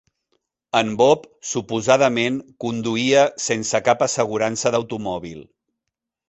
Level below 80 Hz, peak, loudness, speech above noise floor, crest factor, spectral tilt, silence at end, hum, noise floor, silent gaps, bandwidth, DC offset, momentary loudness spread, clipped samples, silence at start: -58 dBFS; -2 dBFS; -20 LUFS; 63 dB; 18 dB; -3.5 dB/octave; 0.85 s; none; -82 dBFS; none; 8.4 kHz; under 0.1%; 11 LU; under 0.1%; 0.75 s